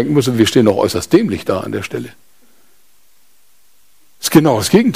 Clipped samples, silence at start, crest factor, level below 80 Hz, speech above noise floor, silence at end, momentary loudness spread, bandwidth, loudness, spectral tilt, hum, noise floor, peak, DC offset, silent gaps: under 0.1%; 0 s; 16 dB; -48 dBFS; 43 dB; 0 s; 12 LU; 16 kHz; -14 LUFS; -5.5 dB/octave; none; -56 dBFS; 0 dBFS; 0.6%; none